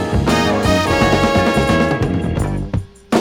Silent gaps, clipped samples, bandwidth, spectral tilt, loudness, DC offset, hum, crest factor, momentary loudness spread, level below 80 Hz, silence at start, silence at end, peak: none; under 0.1%; 17.5 kHz; -5.5 dB/octave; -16 LUFS; under 0.1%; none; 14 dB; 7 LU; -28 dBFS; 0 s; 0 s; 0 dBFS